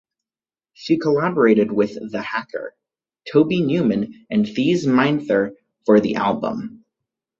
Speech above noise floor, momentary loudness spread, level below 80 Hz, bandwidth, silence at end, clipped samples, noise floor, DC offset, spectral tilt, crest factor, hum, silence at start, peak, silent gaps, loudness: over 71 dB; 15 LU; -60 dBFS; 7.4 kHz; 0.65 s; under 0.1%; under -90 dBFS; under 0.1%; -7 dB/octave; 18 dB; none; 0.8 s; -2 dBFS; none; -19 LUFS